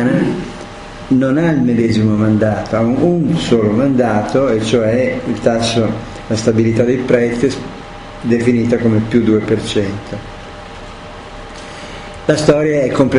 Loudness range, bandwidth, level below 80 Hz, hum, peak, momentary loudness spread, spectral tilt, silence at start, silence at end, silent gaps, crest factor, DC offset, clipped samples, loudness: 5 LU; 10.5 kHz; -38 dBFS; none; 0 dBFS; 18 LU; -6.5 dB/octave; 0 s; 0 s; none; 14 dB; under 0.1%; under 0.1%; -14 LUFS